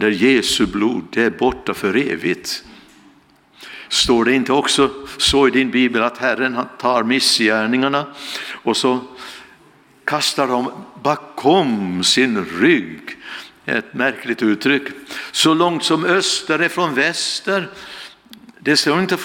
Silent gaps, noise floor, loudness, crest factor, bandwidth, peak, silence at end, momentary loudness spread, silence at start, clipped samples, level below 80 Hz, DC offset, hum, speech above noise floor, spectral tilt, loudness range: none; -51 dBFS; -17 LUFS; 16 dB; 18 kHz; -2 dBFS; 0 s; 14 LU; 0 s; under 0.1%; -48 dBFS; under 0.1%; none; 34 dB; -3 dB/octave; 4 LU